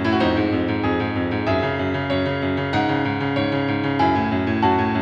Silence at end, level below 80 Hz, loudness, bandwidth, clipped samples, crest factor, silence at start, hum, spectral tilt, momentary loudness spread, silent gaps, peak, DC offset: 0 s; -46 dBFS; -21 LUFS; 7.6 kHz; under 0.1%; 14 dB; 0 s; none; -8 dB/octave; 3 LU; none; -6 dBFS; under 0.1%